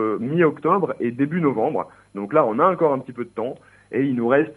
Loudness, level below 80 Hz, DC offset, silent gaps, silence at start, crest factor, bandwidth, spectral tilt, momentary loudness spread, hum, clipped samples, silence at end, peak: -21 LUFS; -66 dBFS; under 0.1%; none; 0 s; 18 dB; 10.5 kHz; -9.5 dB/octave; 13 LU; none; under 0.1%; 0.05 s; -4 dBFS